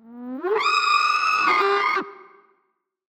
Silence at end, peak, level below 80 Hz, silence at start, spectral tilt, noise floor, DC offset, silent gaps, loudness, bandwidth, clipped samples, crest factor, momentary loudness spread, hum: 0.9 s; -8 dBFS; -74 dBFS; 0.05 s; -1 dB/octave; -72 dBFS; under 0.1%; none; -20 LUFS; 15 kHz; under 0.1%; 16 dB; 12 LU; none